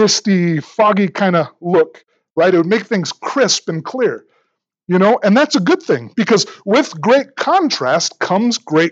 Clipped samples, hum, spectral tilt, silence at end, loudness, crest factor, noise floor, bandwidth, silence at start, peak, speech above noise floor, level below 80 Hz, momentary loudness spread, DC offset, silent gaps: under 0.1%; none; -4.5 dB/octave; 0 s; -15 LUFS; 14 dB; -67 dBFS; 8.2 kHz; 0 s; 0 dBFS; 52 dB; -74 dBFS; 6 LU; under 0.1%; 2.31-2.36 s